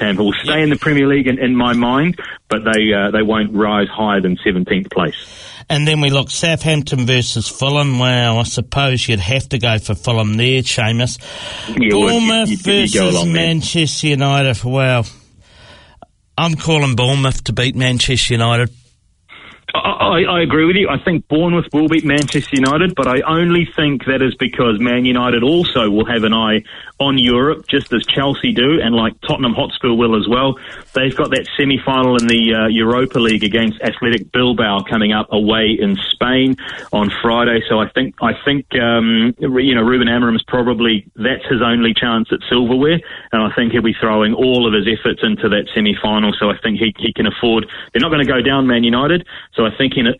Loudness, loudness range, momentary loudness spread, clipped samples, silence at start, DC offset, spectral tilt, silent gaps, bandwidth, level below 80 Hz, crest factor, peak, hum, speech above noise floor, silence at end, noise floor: -14 LUFS; 2 LU; 5 LU; under 0.1%; 0 s; under 0.1%; -5 dB/octave; none; 11 kHz; -40 dBFS; 14 dB; -2 dBFS; none; 39 dB; 0.05 s; -53 dBFS